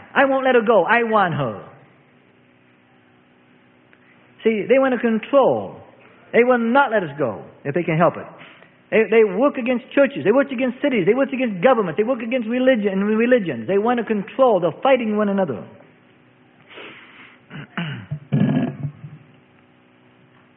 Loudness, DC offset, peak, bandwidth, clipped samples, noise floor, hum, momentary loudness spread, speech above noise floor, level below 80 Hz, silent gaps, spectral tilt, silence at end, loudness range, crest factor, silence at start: -19 LUFS; under 0.1%; -2 dBFS; 4 kHz; under 0.1%; -54 dBFS; none; 15 LU; 36 dB; -64 dBFS; none; -11.5 dB/octave; 1.4 s; 8 LU; 18 dB; 0.15 s